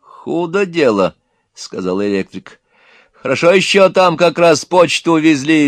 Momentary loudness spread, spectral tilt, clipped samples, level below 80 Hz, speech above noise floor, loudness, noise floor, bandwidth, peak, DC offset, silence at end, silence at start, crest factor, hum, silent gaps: 15 LU; -4.5 dB/octave; 0.2%; -60 dBFS; 37 dB; -13 LUFS; -49 dBFS; 14.5 kHz; 0 dBFS; under 0.1%; 0 s; 0.25 s; 14 dB; none; none